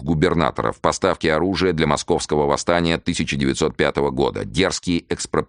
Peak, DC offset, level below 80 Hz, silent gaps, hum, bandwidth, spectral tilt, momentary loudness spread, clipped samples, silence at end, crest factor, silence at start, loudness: 0 dBFS; under 0.1%; -40 dBFS; none; none; 10 kHz; -5 dB/octave; 4 LU; under 0.1%; 0.05 s; 18 dB; 0 s; -20 LUFS